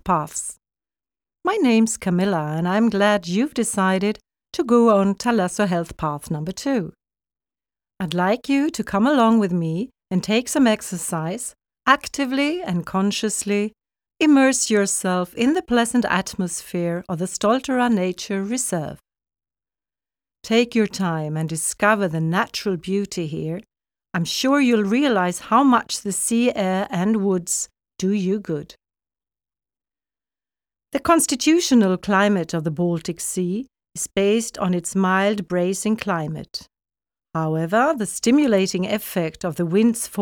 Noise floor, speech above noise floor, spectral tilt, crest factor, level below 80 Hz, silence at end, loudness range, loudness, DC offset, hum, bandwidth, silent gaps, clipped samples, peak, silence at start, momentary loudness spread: under -90 dBFS; over 70 dB; -4.5 dB/octave; 22 dB; -56 dBFS; 0 s; 5 LU; -21 LUFS; under 0.1%; none; 19 kHz; none; under 0.1%; 0 dBFS; 0.05 s; 10 LU